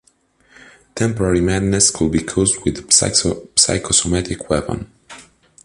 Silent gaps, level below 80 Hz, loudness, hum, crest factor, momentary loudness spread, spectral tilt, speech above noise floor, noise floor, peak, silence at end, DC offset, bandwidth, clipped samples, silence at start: none; -36 dBFS; -16 LUFS; none; 18 dB; 9 LU; -3 dB/octave; 40 dB; -57 dBFS; 0 dBFS; 0.45 s; under 0.1%; 11.5 kHz; under 0.1%; 0.95 s